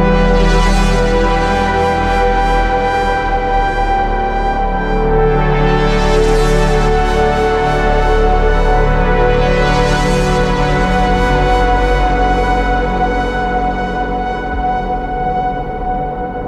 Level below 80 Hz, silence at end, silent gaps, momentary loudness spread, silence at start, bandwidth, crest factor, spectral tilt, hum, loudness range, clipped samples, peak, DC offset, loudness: -16 dBFS; 0 s; none; 5 LU; 0 s; 11 kHz; 12 dB; -6 dB/octave; none; 3 LU; under 0.1%; 0 dBFS; under 0.1%; -14 LUFS